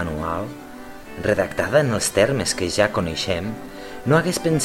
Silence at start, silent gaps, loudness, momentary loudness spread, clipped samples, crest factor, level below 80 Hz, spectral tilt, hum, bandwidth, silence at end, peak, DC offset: 0 s; none; -21 LUFS; 17 LU; under 0.1%; 20 dB; -44 dBFS; -4.5 dB/octave; none; 16.5 kHz; 0 s; -2 dBFS; under 0.1%